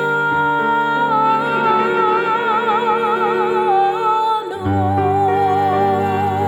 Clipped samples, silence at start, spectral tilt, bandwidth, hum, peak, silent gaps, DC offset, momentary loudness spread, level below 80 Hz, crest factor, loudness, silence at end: under 0.1%; 0 s; -7 dB/octave; 18 kHz; none; -4 dBFS; none; under 0.1%; 2 LU; -54 dBFS; 12 dB; -16 LUFS; 0 s